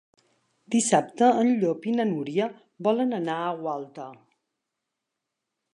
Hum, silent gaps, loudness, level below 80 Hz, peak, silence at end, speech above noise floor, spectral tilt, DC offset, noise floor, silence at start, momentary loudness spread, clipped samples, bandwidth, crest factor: none; none; -25 LUFS; -82 dBFS; -6 dBFS; 1.6 s; 59 dB; -5 dB/octave; under 0.1%; -84 dBFS; 0.7 s; 13 LU; under 0.1%; 11 kHz; 22 dB